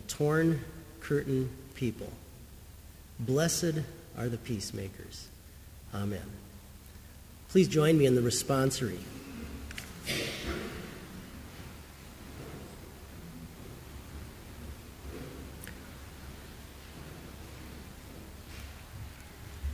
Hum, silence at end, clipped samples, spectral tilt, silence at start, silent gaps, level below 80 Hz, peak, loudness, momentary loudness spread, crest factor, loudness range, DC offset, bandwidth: none; 0 s; under 0.1%; -5 dB/octave; 0 s; none; -50 dBFS; -12 dBFS; -32 LUFS; 22 LU; 22 dB; 18 LU; under 0.1%; 16 kHz